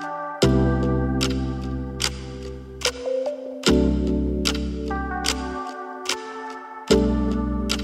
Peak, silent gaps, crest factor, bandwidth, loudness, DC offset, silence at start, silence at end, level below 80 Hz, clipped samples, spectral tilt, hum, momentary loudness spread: -4 dBFS; none; 20 dB; 15.5 kHz; -24 LUFS; under 0.1%; 0 s; 0 s; -30 dBFS; under 0.1%; -5 dB/octave; none; 14 LU